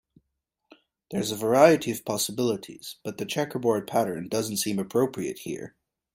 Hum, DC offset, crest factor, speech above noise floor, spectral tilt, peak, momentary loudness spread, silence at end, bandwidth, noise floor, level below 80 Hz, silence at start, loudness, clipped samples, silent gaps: none; under 0.1%; 22 dB; 55 dB; -4.5 dB/octave; -4 dBFS; 17 LU; 0.45 s; 16.5 kHz; -81 dBFS; -66 dBFS; 1.1 s; -26 LUFS; under 0.1%; none